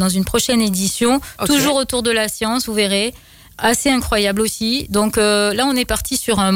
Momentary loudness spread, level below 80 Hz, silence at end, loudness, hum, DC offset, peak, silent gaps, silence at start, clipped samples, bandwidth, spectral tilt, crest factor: 4 LU; -38 dBFS; 0 s; -16 LUFS; none; under 0.1%; -4 dBFS; none; 0 s; under 0.1%; 16.5 kHz; -3.5 dB/octave; 12 dB